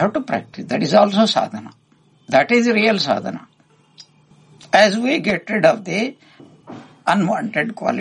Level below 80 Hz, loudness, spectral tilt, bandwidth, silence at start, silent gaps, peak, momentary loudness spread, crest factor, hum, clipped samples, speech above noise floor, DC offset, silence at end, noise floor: -62 dBFS; -17 LUFS; -5 dB/octave; 10.5 kHz; 0 s; none; 0 dBFS; 11 LU; 18 dB; none; under 0.1%; 36 dB; under 0.1%; 0 s; -54 dBFS